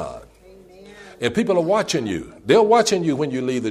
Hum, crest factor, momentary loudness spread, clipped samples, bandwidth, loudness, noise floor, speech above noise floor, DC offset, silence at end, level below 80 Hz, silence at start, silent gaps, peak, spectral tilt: none; 16 dB; 13 LU; under 0.1%; 15 kHz; -19 LUFS; -47 dBFS; 28 dB; under 0.1%; 0 s; -54 dBFS; 0 s; none; -4 dBFS; -4.5 dB/octave